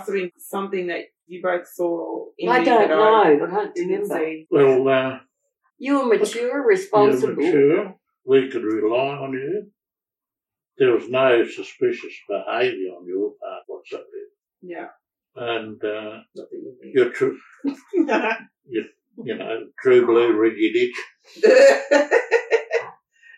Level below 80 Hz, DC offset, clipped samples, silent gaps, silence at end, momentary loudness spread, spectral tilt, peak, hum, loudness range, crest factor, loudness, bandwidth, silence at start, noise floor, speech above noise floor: -78 dBFS; under 0.1%; under 0.1%; none; 0.45 s; 20 LU; -5 dB/octave; -4 dBFS; none; 11 LU; 18 dB; -20 LUFS; 12.5 kHz; 0 s; -90 dBFS; 70 dB